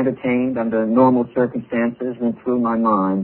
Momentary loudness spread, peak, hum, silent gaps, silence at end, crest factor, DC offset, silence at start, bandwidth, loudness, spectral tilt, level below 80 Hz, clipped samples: 8 LU; -2 dBFS; none; none; 0 s; 16 dB; under 0.1%; 0 s; 4.2 kHz; -19 LUFS; -12 dB/octave; -58 dBFS; under 0.1%